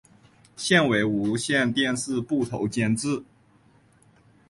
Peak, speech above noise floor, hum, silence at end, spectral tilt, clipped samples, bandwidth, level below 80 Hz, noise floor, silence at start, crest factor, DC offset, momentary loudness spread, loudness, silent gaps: -6 dBFS; 35 dB; none; 1.25 s; -4.5 dB/octave; under 0.1%; 11.5 kHz; -58 dBFS; -59 dBFS; 0.6 s; 20 dB; under 0.1%; 8 LU; -24 LUFS; none